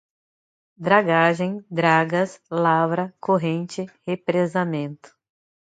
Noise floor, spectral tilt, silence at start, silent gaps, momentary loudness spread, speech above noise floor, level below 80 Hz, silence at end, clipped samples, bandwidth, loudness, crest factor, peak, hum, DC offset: under -90 dBFS; -6.5 dB/octave; 0.8 s; none; 11 LU; over 69 dB; -70 dBFS; 0.7 s; under 0.1%; 9.2 kHz; -22 LUFS; 22 dB; -2 dBFS; none; under 0.1%